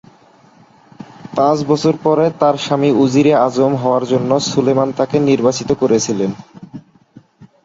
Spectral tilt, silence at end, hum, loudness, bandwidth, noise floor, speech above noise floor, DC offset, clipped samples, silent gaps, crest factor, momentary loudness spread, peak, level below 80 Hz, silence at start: -6 dB/octave; 0.2 s; none; -14 LUFS; 7.8 kHz; -47 dBFS; 34 dB; under 0.1%; under 0.1%; none; 14 dB; 9 LU; -2 dBFS; -54 dBFS; 1 s